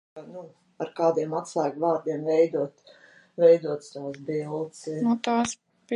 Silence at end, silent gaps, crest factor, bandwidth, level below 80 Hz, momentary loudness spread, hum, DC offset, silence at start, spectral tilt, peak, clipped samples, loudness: 0 s; none; 18 dB; 10.5 kHz; -72 dBFS; 20 LU; none; under 0.1%; 0.15 s; -5.5 dB/octave; -8 dBFS; under 0.1%; -26 LUFS